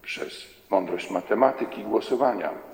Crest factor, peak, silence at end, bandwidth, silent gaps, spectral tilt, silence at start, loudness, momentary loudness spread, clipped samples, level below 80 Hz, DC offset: 22 dB; -4 dBFS; 0 s; 17 kHz; none; -5 dB/octave; 0.05 s; -26 LUFS; 11 LU; under 0.1%; -68 dBFS; under 0.1%